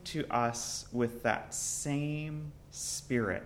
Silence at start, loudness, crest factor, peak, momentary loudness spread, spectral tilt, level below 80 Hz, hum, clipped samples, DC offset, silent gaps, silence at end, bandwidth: 0 s; -34 LUFS; 22 dB; -14 dBFS; 8 LU; -4 dB/octave; -58 dBFS; none; under 0.1%; under 0.1%; none; 0 s; 16.5 kHz